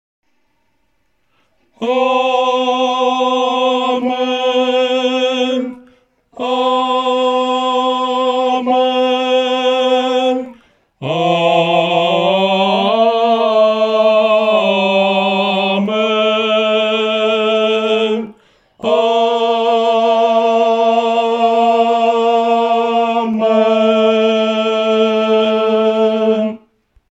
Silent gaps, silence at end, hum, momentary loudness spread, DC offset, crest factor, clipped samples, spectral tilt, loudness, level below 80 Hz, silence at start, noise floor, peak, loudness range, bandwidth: none; 0.55 s; none; 4 LU; under 0.1%; 14 dB; under 0.1%; -5 dB/octave; -14 LUFS; -66 dBFS; 1.8 s; -65 dBFS; 0 dBFS; 4 LU; 8.2 kHz